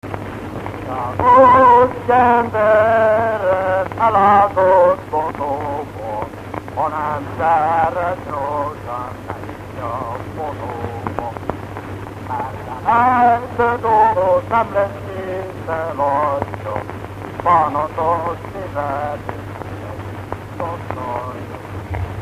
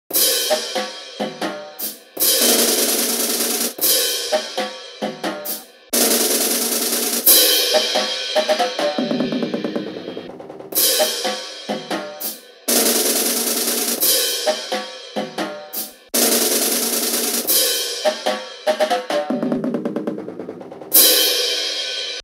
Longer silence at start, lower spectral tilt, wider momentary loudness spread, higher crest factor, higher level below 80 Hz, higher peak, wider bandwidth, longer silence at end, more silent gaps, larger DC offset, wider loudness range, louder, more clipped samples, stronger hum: about the same, 0.05 s vs 0.1 s; first, -7 dB/octave vs -0.5 dB/octave; first, 17 LU vs 14 LU; about the same, 18 dB vs 20 dB; first, -42 dBFS vs -70 dBFS; about the same, 0 dBFS vs 0 dBFS; about the same, 15 kHz vs 16.5 kHz; about the same, 0 s vs 0 s; neither; neither; first, 13 LU vs 5 LU; about the same, -17 LUFS vs -17 LUFS; neither; neither